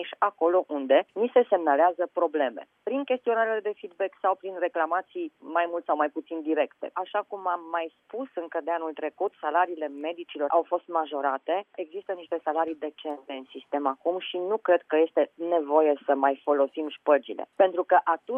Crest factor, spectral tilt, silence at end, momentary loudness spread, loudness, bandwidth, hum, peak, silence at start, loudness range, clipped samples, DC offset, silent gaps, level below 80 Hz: 18 dB; -6.5 dB/octave; 0 s; 12 LU; -27 LUFS; 3.7 kHz; none; -8 dBFS; 0 s; 6 LU; under 0.1%; under 0.1%; none; -88 dBFS